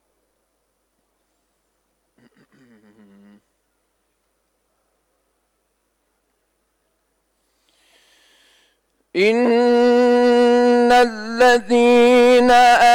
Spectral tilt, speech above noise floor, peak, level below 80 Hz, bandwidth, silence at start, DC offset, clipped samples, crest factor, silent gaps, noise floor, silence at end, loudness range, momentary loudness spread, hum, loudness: -3.5 dB/octave; 57 dB; -6 dBFS; -54 dBFS; 14 kHz; 9.15 s; under 0.1%; under 0.1%; 12 dB; none; -70 dBFS; 0 s; 11 LU; 5 LU; none; -14 LUFS